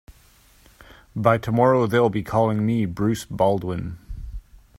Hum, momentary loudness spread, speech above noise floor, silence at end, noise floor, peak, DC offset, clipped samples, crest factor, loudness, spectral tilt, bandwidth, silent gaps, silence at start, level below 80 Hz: none; 20 LU; 34 dB; 0.4 s; -54 dBFS; -2 dBFS; under 0.1%; under 0.1%; 22 dB; -21 LUFS; -7.5 dB/octave; 16 kHz; none; 0.1 s; -44 dBFS